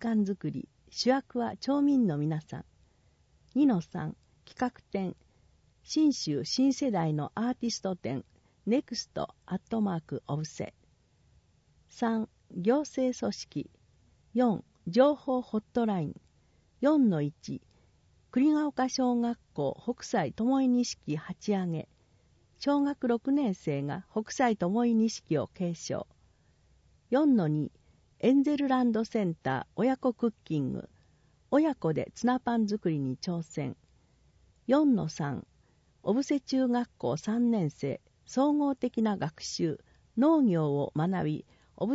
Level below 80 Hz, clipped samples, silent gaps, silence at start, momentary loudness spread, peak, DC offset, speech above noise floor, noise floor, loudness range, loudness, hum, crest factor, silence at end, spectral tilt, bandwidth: -66 dBFS; under 0.1%; none; 0 s; 12 LU; -10 dBFS; under 0.1%; 37 dB; -66 dBFS; 5 LU; -30 LUFS; none; 20 dB; 0 s; -6 dB/octave; 8 kHz